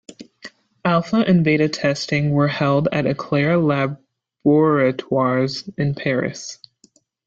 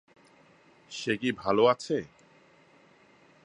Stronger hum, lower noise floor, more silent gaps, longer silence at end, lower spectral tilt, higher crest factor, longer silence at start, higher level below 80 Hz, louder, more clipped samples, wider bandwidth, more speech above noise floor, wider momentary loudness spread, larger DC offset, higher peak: neither; about the same, -57 dBFS vs -60 dBFS; neither; second, 0.75 s vs 1.4 s; first, -6.5 dB/octave vs -5 dB/octave; second, 16 dB vs 22 dB; second, 0.1 s vs 0.9 s; first, -56 dBFS vs -68 dBFS; first, -19 LUFS vs -28 LUFS; neither; second, 7.8 kHz vs 10.5 kHz; first, 39 dB vs 33 dB; second, 10 LU vs 16 LU; neither; first, -4 dBFS vs -10 dBFS